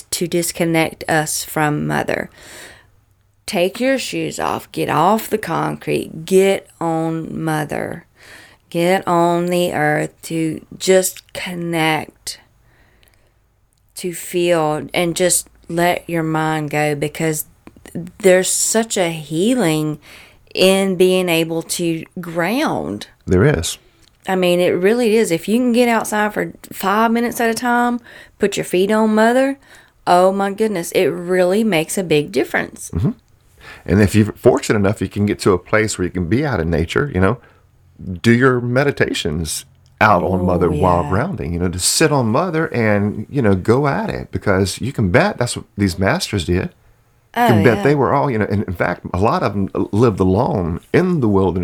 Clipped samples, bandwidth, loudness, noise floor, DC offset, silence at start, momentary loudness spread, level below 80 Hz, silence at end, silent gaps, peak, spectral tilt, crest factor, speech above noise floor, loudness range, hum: under 0.1%; 20 kHz; -17 LUFS; -58 dBFS; under 0.1%; 0.1 s; 10 LU; -42 dBFS; 0 s; none; 0 dBFS; -5 dB/octave; 16 dB; 42 dB; 4 LU; none